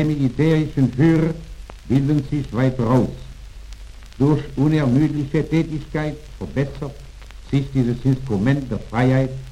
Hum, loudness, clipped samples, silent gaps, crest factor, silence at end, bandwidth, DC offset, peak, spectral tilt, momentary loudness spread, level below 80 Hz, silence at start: none; -20 LUFS; under 0.1%; none; 14 dB; 0 s; 10.5 kHz; under 0.1%; -4 dBFS; -8.5 dB/octave; 21 LU; -38 dBFS; 0 s